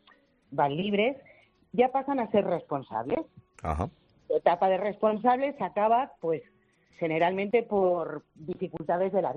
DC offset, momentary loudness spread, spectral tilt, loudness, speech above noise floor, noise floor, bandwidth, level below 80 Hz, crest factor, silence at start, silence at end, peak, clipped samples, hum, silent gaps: under 0.1%; 11 LU; -8 dB/octave; -28 LUFS; 35 dB; -62 dBFS; 8.4 kHz; -56 dBFS; 20 dB; 0.5 s; 0 s; -10 dBFS; under 0.1%; none; none